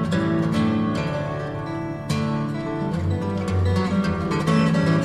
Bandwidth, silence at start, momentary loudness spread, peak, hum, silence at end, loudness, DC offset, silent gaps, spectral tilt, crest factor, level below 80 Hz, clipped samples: 12 kHz; 0 s; 9 LU; -8 dBFS; none; 0 s; -23 LUFS; under 0.1%; none; -7 dB/octave; 14 dB; -44 dBFS; under 0.1%